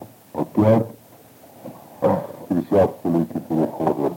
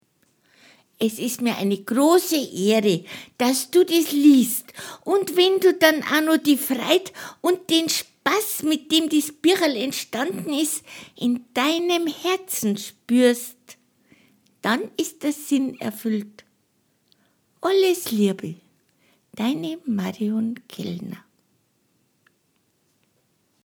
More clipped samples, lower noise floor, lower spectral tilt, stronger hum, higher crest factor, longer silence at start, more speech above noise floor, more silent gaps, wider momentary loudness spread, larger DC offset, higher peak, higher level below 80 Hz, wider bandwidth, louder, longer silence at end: neither; second, -48 dBFS vs -68 dBFS; first, -9 dB/octave vs -3.5 dB/octave; neither; second, 16 dB vs 22 dB; second, 0 s vs 1 s; second, 28 dB vs 46 dB; neither; first, 20 LU vs 12 LU; neither; second, -4 dBFS vs 0 dBFS; first, -64 dBFS vs -74 dBFS; second, 17 kHz vs over 20 kHz; about the same, -21 LUFS vs -21 LUFS; second, 0 s vs 2.45 s